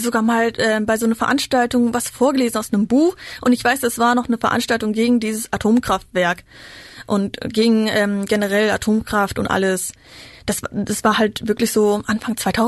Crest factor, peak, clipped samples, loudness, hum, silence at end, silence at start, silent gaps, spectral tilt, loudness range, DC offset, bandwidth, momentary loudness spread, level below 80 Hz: 12 dB; -6 dBFS; under 0.1%; -18 LUFS; none; 0 s; 0 s; none; -4.5 dB/octave; 2 LU; under 0.1%; 12.5 kHz; 6 LU; -46 dBFS